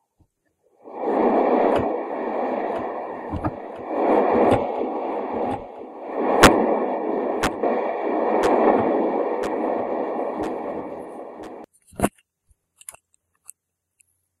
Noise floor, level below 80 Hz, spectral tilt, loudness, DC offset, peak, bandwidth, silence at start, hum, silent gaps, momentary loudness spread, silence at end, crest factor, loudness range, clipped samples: -71 dBFS; -44 dBFS; -5 dB/octave; -22 LUFS; under 0.1%; 0 dBFS; 15 kHz; 0.85 s; none; none; 19 LU; 2.3 s; 24 dB; 12 LU; under 0.1%